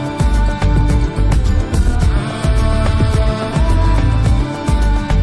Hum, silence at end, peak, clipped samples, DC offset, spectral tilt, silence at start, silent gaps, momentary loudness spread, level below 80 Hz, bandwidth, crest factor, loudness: none; 0 s; -2 dBFS; under 0.1%; under 0.1%; -6.5 dB/octave; 0 s; none; 3 LU; -14 dBFS; 11 kHz; 10 dB; -16 LUFS